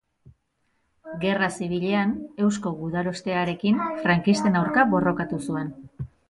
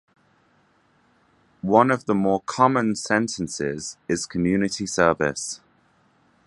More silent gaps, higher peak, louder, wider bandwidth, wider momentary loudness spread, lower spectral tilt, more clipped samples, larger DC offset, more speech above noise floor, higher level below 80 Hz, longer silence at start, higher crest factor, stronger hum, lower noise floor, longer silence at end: neither; second, -6 dBFS vs -2 dBFS; about the same, -24 LUFS vs -22 LUFS; about the same, 11.5 kHz vs 11.5 kHz; about the same, 10 LU vs 11 LU; about the same, -6 dB/octave vs -5 dB/octave; neither; neither; first, 48 dB vs 40 dB; about the same, -56 dBFS vs -54 dBFS; second, 0.25 s vs 1.65 s; about the same, 18 dB vs 22 dB; neither; first, -71 dBFS vs -62 dBFS; second, 0.25 s vs 0.9 s